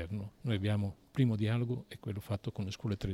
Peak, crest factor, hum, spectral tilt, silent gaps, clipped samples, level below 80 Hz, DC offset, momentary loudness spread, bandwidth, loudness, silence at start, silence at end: -18 dBFS; 16 dB; none; -7.5 dB/octave; none; under 0.1%; -58 dBFS; under 0.1%; 9 LU; 14.5 kHz; -36 LUFS; 0 s; 0 s